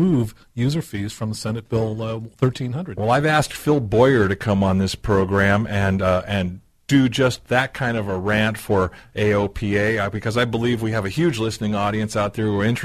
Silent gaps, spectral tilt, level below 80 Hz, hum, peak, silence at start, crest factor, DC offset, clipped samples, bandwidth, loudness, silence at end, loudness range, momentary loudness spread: none; -6 dB/octave; -42 dBFS; none; -2 dBFS; 0 s; 18 dB; under 0.1%; under 0.1%; 13.5 kHz; -21 LUFS; 0 s; 3 LU; 8 LU